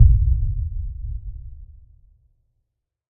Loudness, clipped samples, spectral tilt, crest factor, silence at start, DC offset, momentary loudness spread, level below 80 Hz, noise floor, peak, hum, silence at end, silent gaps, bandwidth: -24 LUFS; under 0.1%; -16.5 dB/octave; 20 dB; 0 s; under 0.1%; 23 LU; -24 dBFS; -76 dBFS; 0 dBFS; none; 1.5 s; none; 0.4 kHz